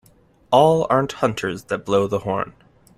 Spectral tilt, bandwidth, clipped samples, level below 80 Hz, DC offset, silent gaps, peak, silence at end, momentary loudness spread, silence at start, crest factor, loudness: -6 dB/octave; 14.5 kHz; under 0.1%; -54 dBFS; under 0.1%; none; -2 dBFS; 0.5 s; 11 LU; 0.5 s; 18 dB; -20 LUFS